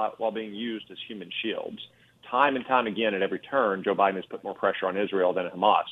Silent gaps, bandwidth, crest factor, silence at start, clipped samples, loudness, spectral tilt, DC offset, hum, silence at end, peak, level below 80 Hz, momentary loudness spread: none; 5 kHz; 20 dB; 0 s; under 0.1%; -27 LUFS; -7 dB/octave; under 0.1%; none; 0 s; -6 dBFS; -72 dBFS; 13 LU